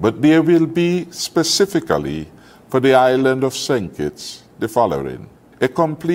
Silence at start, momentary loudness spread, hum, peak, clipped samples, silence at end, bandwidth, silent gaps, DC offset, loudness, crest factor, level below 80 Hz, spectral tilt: 0 s; 15 LU; none; 0 dBFS; under 0.1%; 0 s; 16 kHz; none; under 0.1%; -17 LUFS; 16 dB; -50 dBFS; -5 dB/octave